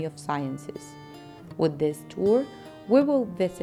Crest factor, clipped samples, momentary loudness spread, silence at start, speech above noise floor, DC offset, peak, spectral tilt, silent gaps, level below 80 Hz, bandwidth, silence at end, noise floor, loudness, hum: 18 dB; under 0.1%; 22 LU; 0 s; 18 dB; under 0.1%; -8 dBFS; -7 dB/octave; none; -64 dBFS; 14.5 kHz; 0 s; -44 dBFS; -26 LUFS; none